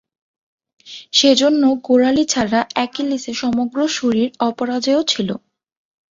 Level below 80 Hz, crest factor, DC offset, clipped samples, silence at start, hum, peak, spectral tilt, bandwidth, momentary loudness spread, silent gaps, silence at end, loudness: -56 dBFS; 18 dB; under 0.1%; under 0.1%; 0.85 s; none; 0 dBFS; -3.5 dB/octave; 7.8 kHz; 9 LU; none; 0.7 s; -17 LUFS